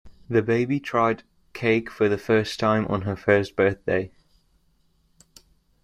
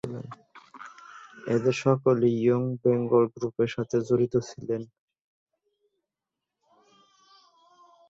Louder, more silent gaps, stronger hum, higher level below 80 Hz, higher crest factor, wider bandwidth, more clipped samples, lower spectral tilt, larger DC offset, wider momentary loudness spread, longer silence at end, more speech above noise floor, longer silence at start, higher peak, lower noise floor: first, -23 LUFS vs -26 LUFS; neither; neither; first, -56 dBFS vs -66 dBFS; about the same, 20 dB vs 20 dB; first, 14 kHz vs 7.8 kHz; neither; about the same, -6.5 dB/octave vs -7.5 dB/octave; neither; second, 6 LU vs 23 LU; second, 1.75 s vs 3.25 s; second, 41 dB vs 63 dB; about the same, 0.05 s vs 0.05 s; first, -4 dBFS vs -8 dBFS; second, -64 dBFS vs -88 dBFS